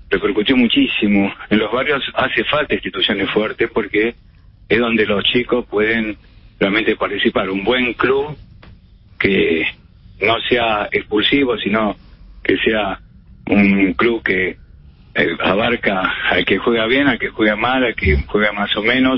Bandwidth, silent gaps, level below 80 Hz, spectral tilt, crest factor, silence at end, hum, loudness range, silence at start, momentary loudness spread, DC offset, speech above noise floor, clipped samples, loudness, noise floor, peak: 5.8 kHz; none; -36 dBFS; -10.5 dB/octave; 16 dB; 0 s; none; 2 LU; 0.1 s; 6 LU; under 0.1%; 28 dB; under 0.1%; -16 LUFS; -44 dBFS; 0 dBFS